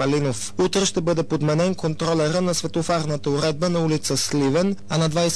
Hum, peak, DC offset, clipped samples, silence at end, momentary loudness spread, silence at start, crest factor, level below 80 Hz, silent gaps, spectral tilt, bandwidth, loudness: none; -12 dBFS; 1%; under 0.1%; 0 s; 3 LU; 0 s; 10 dB; -48 dBFS; none; -5 dB/octave; 11 kHz; -22 LUFS